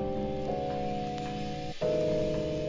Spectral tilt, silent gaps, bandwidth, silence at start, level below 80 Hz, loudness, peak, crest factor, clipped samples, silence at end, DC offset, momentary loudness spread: -7 dB/octave; none; 7.6 kHz; 0 s; -48 dBFS; -32 LUFS; -18 dBFS; 14 dB; under 0.1%; 0 s; 0.2%; 7 LU